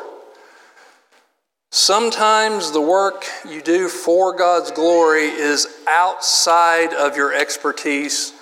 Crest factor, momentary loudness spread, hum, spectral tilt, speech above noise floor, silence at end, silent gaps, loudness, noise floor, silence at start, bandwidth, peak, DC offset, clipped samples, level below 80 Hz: 16 dB; 7 LU; none; -0.5 dB/octave; 50 dB; 0.1 s; none; -16 LUFS; -66 dBFS; 0 s; 17 kHz; -2 dBFS; under 0.1%; under 0.1%; -88 dBFS